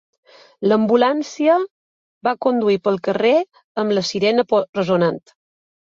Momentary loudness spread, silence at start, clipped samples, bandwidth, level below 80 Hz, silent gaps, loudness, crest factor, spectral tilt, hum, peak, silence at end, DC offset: 8 LU; 0.6 s; under 0.1%; 7.6 kHz; -64 dBFS; 1.70-2.21 s, 3.64-3.75 s, 4.69-4.73 s; -18 LUFS; 16 dB; -5.5 dB/octave; none; -4 dBFS; 0.75 s; under 0.1%